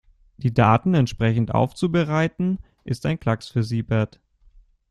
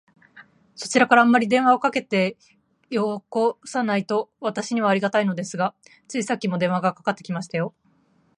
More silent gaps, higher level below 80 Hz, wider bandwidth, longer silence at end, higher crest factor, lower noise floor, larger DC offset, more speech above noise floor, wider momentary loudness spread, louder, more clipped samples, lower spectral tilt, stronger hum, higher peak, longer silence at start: neither; first, -48 dBFS vs -72 dBFS; about the same, 11 kHz vs 11.5 kHz; first, 0.85 s vs 0.7 s; about the same, 20 dB vs 20 dB; second, -54 dBFS vs -62 dBFS; neither; second, 33 dB vs 40 dB; about the same, 10 LU vs 11 LU; about the same, -22 LUFS vs -22 LUFS; neither; first, -7.5 dB/octave vs -5 dB/octave; neither; about the same, -2 dBFS vs -2 dBFS; about the same, 0.4 s vs 0.35 s